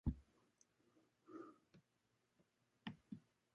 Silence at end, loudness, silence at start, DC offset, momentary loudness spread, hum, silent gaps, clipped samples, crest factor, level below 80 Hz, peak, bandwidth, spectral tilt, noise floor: 0.35 s; -57 LUFS; 0.05 s; under 0.1%; 8 LU; none; none; under 0.1%; 24 dB; -60 dBFS; -30 dBFS; 8 kHz; -7 dB/octave; -85 dBFS